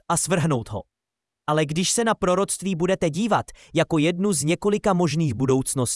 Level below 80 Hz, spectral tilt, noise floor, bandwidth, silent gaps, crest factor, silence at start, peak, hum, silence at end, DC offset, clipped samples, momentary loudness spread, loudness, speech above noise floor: -50 dBFS; -4.5 dB/octave; -86 dBFS; 12 kHz; none; 16 dB; 0.1 s; -6 dBFS; none; 0 s; under 0.1%; under 0.1%; 4 LU; -22 LUFS; 64 dB